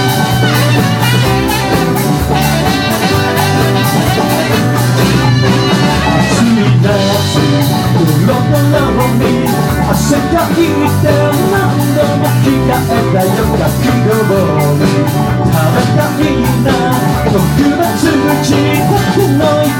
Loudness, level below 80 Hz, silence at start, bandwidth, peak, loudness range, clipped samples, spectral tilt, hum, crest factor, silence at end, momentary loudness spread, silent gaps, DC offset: -10 LUFS; -28 dBFS; 0 s; 17.5 kHz; 0 dBFS; 1 LU; under 0.1%; -5.5 dB/octave; none; 10 dB; 0 s; 2 LU; none; under 0.1%